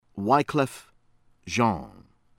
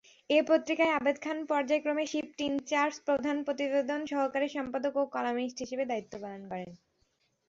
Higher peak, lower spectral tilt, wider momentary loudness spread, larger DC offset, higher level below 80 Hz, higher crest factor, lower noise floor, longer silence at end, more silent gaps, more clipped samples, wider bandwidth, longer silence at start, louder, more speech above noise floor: first, -8 dBFS vs -12 dBFS; first, -5.5 dB/octave vs -4 dB/octave; about the same, 12 LU vs 11 LU; neither; first, -56 dBFS vs -72 dBFS; about the same, 20 dB vs 18 dB; second, -61 dBFS vs -74 dBFS; second, 0.5 s vs 0.7 s; neither; neither; first, 16.5 kHz vs 7.8 kHz; second, 0.15 s vs 0.3 s; first, -25 LUFS vs -31 LUFS; second, 36 dB vs 44 dB